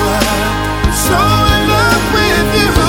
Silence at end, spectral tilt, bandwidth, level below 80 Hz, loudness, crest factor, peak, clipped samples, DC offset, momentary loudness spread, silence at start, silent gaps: 0 s; -4 dB/octave; 17 kHz; -20 dBFS; -11 LUFS; 12 dB; 0 dBFS; under 0.1%; under 0.1%; 4 LU; 0 s; none